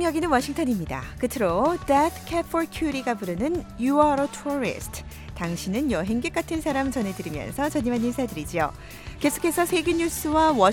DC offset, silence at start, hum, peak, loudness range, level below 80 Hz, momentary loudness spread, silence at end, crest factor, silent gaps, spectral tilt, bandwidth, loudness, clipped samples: under 0.1%; 0 s; none; -6 dBFS; 3 LU; -42 dBFS; 9 LU; 0 s; 20 dB; none; -5 dB/octave; 17.5 kHz; -25 LUFS; under 0.1%